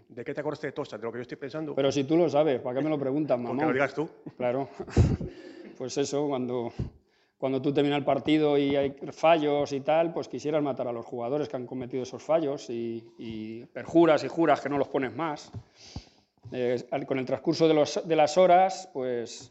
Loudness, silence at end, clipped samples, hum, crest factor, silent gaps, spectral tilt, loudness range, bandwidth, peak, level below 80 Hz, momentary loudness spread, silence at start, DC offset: -27 LUFS; 0.05 s; under 0.1%; none; 20 dB; none; -6 dB/octave; 5 LU; 8.2 kHz; -8 dBFS; -50 dBFS; 16 LU; 0.15 s; under 0.1%